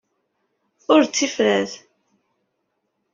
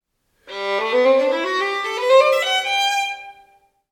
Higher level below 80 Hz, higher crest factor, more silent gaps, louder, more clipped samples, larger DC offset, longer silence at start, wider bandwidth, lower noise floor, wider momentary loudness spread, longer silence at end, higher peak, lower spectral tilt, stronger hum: about the same, -68 dBFS vs -68 dBFS; about the same, 20 dB vs 18 dB; neither; about the same, -19 LUFS vs -18 LUFS; neither; neither; first, 0.9 s vs 0.45 s; second, 7.6 kHz vs 16 kHz; first, -74 dBFS vs -56 dBFS; first, 19 LU vs 12 LU; first, 1.35 s vs 0.6 s; about the same, -2 dBFS vs -2 dBFS; first, -3 dB/octave vs -0.5 dB/octave; neither